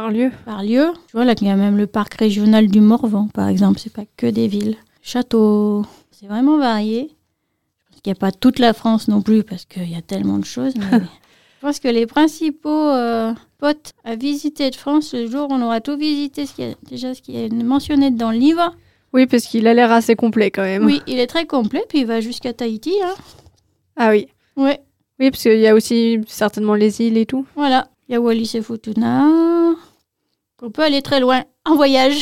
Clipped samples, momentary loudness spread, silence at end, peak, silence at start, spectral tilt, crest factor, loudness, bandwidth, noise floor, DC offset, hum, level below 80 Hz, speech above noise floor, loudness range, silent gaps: under 0.1%; 13 LU; 0 s; 0 dBFS; 0 s; -6 dB/octave; 16 dB; -17 LUFS; 15.5 kHz; -73 dBFS; 0.4%; none; -54 dBFS; 57 dB; 5 LU; none